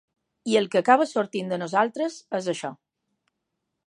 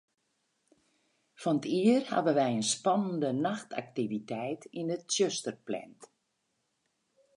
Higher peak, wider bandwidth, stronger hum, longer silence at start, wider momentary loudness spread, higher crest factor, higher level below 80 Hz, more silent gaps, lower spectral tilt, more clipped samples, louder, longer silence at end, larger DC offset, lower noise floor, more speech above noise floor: first, -4 dBFS vs -14 dBFS; about the same, 11.5 kHz vs 11.5 kHz; neither; second, 0.45 s vs 1.4 s; about the same, 12 LU vs 11 LU; about the same, 22 dB vs 18 dB; about the same, -80 dBFS vs -82 dBFS; neither; about the same, -4.5 dB/octave vs -4.5 dB/octave; neither; first, -24 LUFS vs -31 LUFS; second, 1.15 s vs 1.3 s; neither; about the same, -81 dBFS vs -79 dBFS; first, 57 dB vs 49 dB